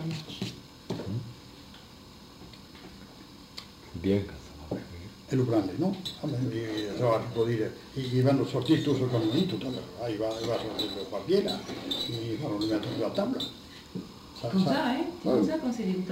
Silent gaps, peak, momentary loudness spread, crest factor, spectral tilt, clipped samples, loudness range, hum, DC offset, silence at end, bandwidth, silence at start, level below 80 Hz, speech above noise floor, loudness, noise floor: none; -12 dBFS; 21 LU; 18 dB; -6.5 dB/octave; under 0.1%; 9 LU; none; under 0.1%; 0 s; 16 kHz; 0 s; -58 dBFS; 21 dB; -30 LUFS; -50 dBFS